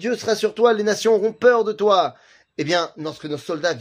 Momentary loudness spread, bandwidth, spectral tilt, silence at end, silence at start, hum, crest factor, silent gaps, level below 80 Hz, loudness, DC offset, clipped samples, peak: 12 LU; 15.5 kHz; -4 dB/octave; 0 s; 0 s; none; 18 dB; none; -68 dBFS; -20 LUFS; under 0.1%; under 0.1%; -2 dBFS